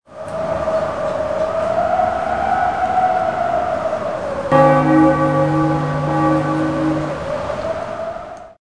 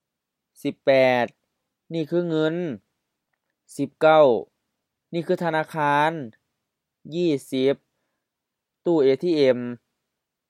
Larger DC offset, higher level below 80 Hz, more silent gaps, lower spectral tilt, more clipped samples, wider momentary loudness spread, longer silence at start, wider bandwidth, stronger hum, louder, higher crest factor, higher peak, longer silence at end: first, 0.4% vs under 0.1%; first, -42 dBFS vs -80 dBFS; neither; about the same, -7.5 dB/octave vs -6.5 dB/octave; neither; second, 11 LU vs 15 LU; second, 0.1 s vs 0.65 s; second, 10.5 kHz vs 14 kHz; neither; first, -18 LUFS vs -22 LUFS; about the same, 18 dB vs 20 dB; first, 0 dBFS vs -4 dBFS; second, 0.1 s vs 0.75 s